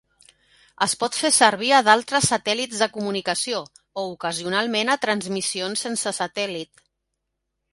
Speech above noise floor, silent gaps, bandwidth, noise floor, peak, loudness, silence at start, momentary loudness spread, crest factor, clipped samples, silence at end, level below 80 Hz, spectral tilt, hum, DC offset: 57 dB; none; 12 kHz; -79 dBFS; 0 dBFS; -21 LUFS; 0.8 s; 12 LU; 22 dB; under 0.1%; 1.1 s; -64 dBFS; -2 dB/octave; none; under 0.1%